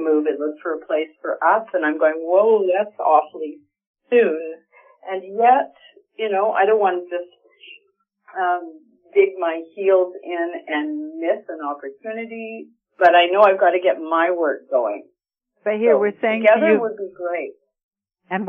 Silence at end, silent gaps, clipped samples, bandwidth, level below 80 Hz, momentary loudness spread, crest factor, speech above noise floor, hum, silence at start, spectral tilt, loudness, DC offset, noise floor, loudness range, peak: 0 s; 3.87-3.94 s, 17.83-17.92 s; under 0.1%; 4.9 kHz; -80 dBFS; 16 LU; 18 dB; 55 dB; none; 0 s; -7 dB/octave; -19 LUFS; under 0.1%; -74 dBFS; 5 LU; -2 dBFS